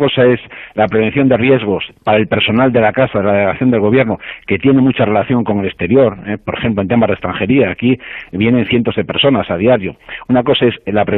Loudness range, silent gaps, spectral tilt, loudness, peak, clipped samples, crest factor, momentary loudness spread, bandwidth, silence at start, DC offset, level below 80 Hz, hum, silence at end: 2 LU; none; -10 dB/octave; -13 LUFS; -2 dBFS; under 0.1%; 12 dB; 7 LU; 4.1 kHz; 0 s; under 0.1%; -44 dBFS; none; 0 s